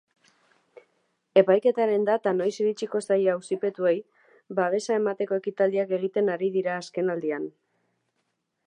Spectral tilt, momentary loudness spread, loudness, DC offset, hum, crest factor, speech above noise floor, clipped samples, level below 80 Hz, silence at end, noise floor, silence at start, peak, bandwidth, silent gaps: -6 dB/octave; 8 LU; -25 LUFS; under 0.1%; none; 22 dB; 52 dB; under 0.1%; -84 dBFS; 1.2 s; -77 dBFS; 1.35 s; -6 dBFS; 10 kHz; none